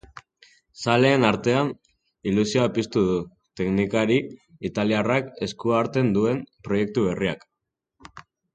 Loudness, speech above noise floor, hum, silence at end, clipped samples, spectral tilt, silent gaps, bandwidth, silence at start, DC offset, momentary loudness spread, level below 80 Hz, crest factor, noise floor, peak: -23 LUFS; 61 dB; none; 0.35 s; under 0.1%; -6 dB/octave; none; 9.2 kHz; 0.8 s; under 0.1%; 11 LU; -54 dBFS; 20 dB; -83 dBFS; -4 dBFS